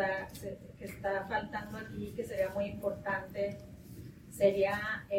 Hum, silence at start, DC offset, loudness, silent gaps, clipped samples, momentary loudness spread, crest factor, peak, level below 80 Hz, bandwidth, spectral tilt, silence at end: none; 0 s; under 0.1%; -35 LUFS; none; under 0.1%; 18 LU; 22 dB; -14 dBFS; -58 dBFS; 16.5 kHz; -5.5 dB/octave; 0 s